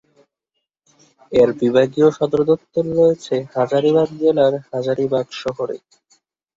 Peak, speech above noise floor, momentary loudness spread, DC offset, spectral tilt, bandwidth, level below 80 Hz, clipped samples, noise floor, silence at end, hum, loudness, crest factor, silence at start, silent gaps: -2 dBFS; 60 dB; 9 LU; under 0.1%; -7 dB/octave; 7.6 kHz; -56 dBFS; under 0.1%; -77 dBFS; 0.8 s; none; -18 LUFS; 16 dB; 1.3 s; none